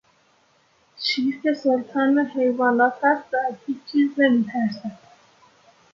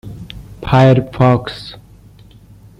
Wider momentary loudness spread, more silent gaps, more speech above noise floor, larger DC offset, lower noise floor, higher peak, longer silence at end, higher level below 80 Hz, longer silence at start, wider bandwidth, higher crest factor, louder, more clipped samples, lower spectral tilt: second, 8 LU vs 23 LU; neither; first, 40 dB vs 30 dB; neither; first, -61 dBFS vs -42 dBFS; second, -6 dBFS vs -2 dBFS; about the same, 1 s vs 1.05 s; second, -72 dBFS vs -38 dBFS; first, 1 s vs 0.05 s; about the same, 7.4 kHz vs 7.2 kHz; about the same, 16 dB vs 14 dB; second, -22 LUFS vs -12 LUFS; neither; second, -5.5 dB/octave vs -8 dB/octave